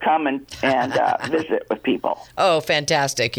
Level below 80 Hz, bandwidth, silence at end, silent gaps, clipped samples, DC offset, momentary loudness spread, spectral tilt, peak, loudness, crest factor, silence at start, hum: -56 dBFS; over 20 kHz; 0 s; none; under 0.1%; under 0.1%; 5 LU; -3.5 dB/octave; -6 dBFS; -21 LUFS; 14 dB; 0 s; none